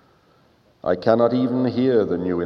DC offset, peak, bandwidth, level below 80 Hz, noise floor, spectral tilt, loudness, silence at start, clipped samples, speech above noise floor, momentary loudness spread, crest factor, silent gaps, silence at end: under 0.1%; -2 dBFS; 6 kHz; -58 dBFS; -57 dBFS; -9 dB/octave; -20 LUFS; 0.85 s; under 0.1%; 38 dB; 6 LU; 18 dB; none; 0 s